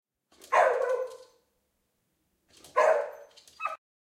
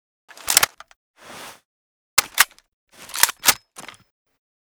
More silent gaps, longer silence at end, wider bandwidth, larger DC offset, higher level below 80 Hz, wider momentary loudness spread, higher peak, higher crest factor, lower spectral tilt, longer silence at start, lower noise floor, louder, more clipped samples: second, none vs 0.96-1.14 s, 1.65-2.17 s, 2.73-2.87 s; second, 0.25 s vs 0.95 s; second, 15 kHz vs over 20 kHz; neither; second, -82 dBFS vs -58 dBFS; second, 13 LU vs 23 LU; second, -10 dBFS vs 0 dBFS; second, 20 dB vs 26 dB; first, -1 dB/octave vs 1.5 dB/octave; about the same, 0.5 s vs 0.45 s; first, -77 dBFS vs -43 dBFS; second, -28 LUFS vs -18 LUFS; neither